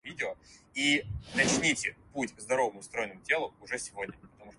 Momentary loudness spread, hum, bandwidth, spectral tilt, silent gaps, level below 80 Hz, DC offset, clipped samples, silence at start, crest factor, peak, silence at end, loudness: 12 LU; none; 11.5 kHz; -2.5 dB/octave; none; -56 dBFS; under 0.1%; under 0.1%; 0.05 s; 22 dB; -10 dBFS; 0.05 s; -31 LUFS